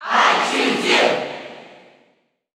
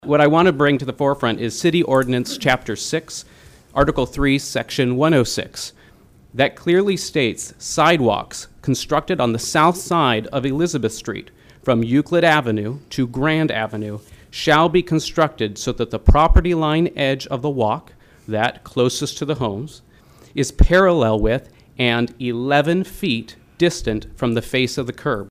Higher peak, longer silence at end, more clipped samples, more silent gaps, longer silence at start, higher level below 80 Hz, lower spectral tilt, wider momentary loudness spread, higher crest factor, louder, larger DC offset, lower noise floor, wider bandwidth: about the same, -2 dBFS vs -4 dBFS; first, 0.9 s vs 0 s; neither; neither; about the same, 0 s vs 0.05 s; second, -78 dBFS vs -30 dBFS; second, -2 dB/octave vs -5 dB/octave; first, 17 LU vs 12 LU; about the same, 18 dB vs 14 dB; first, -16 LUFS vs -19 LUFS; neither; first, -63 dBFS vs -49 dBFS; first, over 20 kHz vs 15.5 kHz